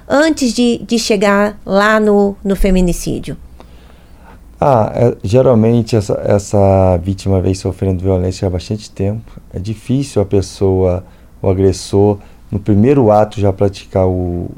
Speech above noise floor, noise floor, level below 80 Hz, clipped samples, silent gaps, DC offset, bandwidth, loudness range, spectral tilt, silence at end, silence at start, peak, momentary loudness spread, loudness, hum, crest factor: 26 dB; -39 dBFS; -30 dBFS; under 0.1%; none; under 0.1%; 15.5 kHz; 5 LU; -6.5 dB/octave; 0.05 s; 0.1 s; 0 dBFS; 11 LU; -14 LUFS; none; 14 dB